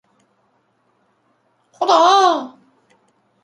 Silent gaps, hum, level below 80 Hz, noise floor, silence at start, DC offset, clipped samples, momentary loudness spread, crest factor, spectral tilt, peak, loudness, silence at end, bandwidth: none; none; -78 dBFS; -63 dBFS; 1.8 s; under 0.1%; under 0.1%; 14 LU; 20 dB; -1 dB/octave; 0 dBFS; -14 LUFS; 0.95 s; 11 kHz